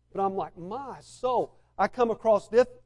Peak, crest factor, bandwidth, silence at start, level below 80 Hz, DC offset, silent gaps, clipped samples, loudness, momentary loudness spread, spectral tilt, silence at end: -10 dBFS; 16 dB; 11 kHz; 0.15 s; -60 dBFS; under 0.1%; none; under 0.1%; -28 LUFS; 14 LU; -6 dB/octave; 0.15 s